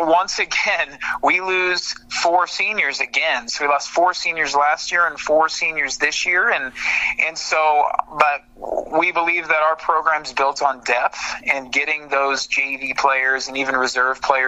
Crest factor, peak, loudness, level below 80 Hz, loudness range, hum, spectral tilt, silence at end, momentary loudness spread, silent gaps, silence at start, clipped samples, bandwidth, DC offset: 20 dB; 0 dBFS; -18 LUFS; -54 dBFS; 1 LU; none; -1 dB/octave; 0 s; 4 LU; none; 0 s; under 0.1%; 12 kHz; under 0.1%